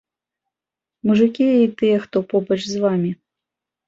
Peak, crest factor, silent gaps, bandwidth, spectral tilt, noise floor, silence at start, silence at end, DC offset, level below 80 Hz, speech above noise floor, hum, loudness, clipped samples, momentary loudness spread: -4 dBFS; 16 dB; none; 7.6 kHz; -7 dB/octave; -88 dBFS; 1.05 s; 0.75 s; under 0.1%; -62 dBFS; 70 dB; none; -19 LUFS; under 0.1%; 8 LU